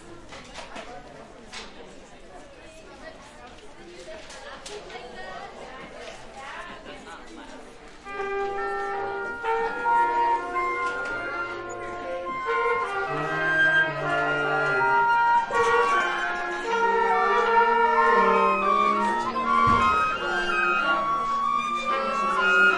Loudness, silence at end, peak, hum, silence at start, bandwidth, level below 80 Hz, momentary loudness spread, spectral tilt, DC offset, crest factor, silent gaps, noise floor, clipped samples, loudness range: -23 LUFS; 0 s; -8 dBFS; none; 0 s; 11.5 kHz; -52 dBFS; 22 LU; -4 dB/octave; under 0.1%; 18 dB; none; -45 dBFS; under 0.1%; 21 LU